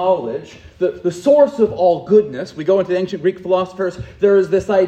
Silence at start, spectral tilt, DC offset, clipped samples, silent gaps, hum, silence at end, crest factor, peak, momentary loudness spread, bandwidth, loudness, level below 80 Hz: 0 s; -7 dB/octave; under 0.1%; under 0.1%; none; none; 0 s; 16 dB; 0 dBFS; 11 LU; 9 kHz; -17 LUFS; -50 dBFS